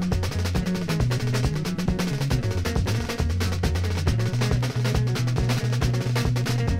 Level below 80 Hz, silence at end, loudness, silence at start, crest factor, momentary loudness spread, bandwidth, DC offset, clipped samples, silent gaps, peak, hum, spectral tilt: -32 dBFS; 0 s; -25 LUFS; 0 s; 16 dB; 2 LU; 16 kHz; under 0.1%; under 0.1%; none; -8 dBFS; none; -6 dB/octave